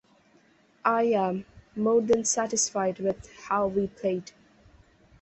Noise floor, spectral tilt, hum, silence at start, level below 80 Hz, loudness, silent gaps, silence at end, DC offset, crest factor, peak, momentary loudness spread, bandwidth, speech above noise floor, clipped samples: -62 dBFS; -4 dB/octave; none; 0.85 s; -60 dBFS; -27 LUFS; none; 1 s; under 0.1%; 20 dB; -8 dBFS; 9 LU; 8.6 kHz; 35 dB; under 0.1%